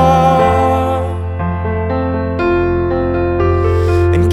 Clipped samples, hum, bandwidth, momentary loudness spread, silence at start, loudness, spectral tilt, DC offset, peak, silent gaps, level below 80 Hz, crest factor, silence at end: under 0.1%; none; 11.5 kHz; 8 LU; 0 s; -14 LUFS; -8 dB/octave; under 0.1%; 0 dBFS; none; -26 dBFS; 12 dB; 0 s